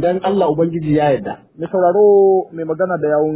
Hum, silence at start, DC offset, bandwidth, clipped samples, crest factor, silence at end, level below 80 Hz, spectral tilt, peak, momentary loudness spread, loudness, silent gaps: none; 0 s; under 0.1%; 4 kHz; under 0.1%; 12 dB; 0 s; -50 dBFS; -11.5 dB/octave; -2 dBFS; 12 LU; -15 LUFS; none